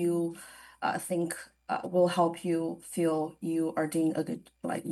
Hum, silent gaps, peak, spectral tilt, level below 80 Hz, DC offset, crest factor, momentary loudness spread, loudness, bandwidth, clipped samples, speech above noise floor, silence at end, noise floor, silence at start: none; none; -14 dBFS; -6 dB/octave; -72 dBFS; under 0.1%; 16 dB; 10 LU; -31 LUFS; 12.5 kHz; under 0.1%; 20 dB; 0 s; -50 dBFS; 0 s